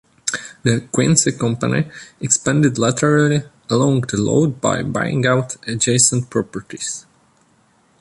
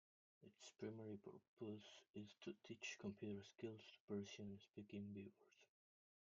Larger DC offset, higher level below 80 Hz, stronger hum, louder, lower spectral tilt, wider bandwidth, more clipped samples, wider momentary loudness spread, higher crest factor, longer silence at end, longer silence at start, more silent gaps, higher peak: neither; first, -50 dBFS vs under -90 dBFS; neither; first, -17 LUFS vs -56 LUFS; about the same, -4.5 dB/octave vs -5 dB/octave; first, 11.5 kHz vs 7.4 kHz; neither; first, 12 LU vs 9 LU; about the same, 18 dB vs 18 dB; first, 1 s vs 0.6 s; second, 0.25 s vs 0.4 s; second, none vs 1.48-1.57 s, 2.10-2.14 s, 4.00-4.08 s; first, 0 dBFS vs -38 dBFS